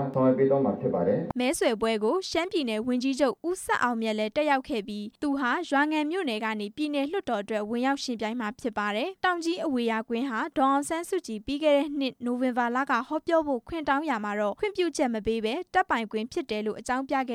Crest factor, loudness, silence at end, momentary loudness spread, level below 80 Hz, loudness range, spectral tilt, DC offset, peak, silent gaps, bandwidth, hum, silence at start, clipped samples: 16 dB; -28 LUFS; 0 s; 7 LU; -60 dBFS; 2 LU; -4.5 dB/octave; under 0.1%; -12 dBFS; none; 15 kHz; none; 0 s; under 0.1%